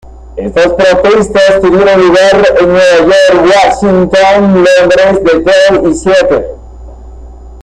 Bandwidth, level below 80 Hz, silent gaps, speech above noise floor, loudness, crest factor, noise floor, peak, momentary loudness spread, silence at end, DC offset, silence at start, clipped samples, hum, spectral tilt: 10.5 kHz; -30 dBFS; none; 22 dB; -6 LUFS; 6 dB; -27 dBFS; 0 dBFS; 5 LU; 0 s; under 0.1%; 0.05 s; under 0.1%; none; -5 dB/octave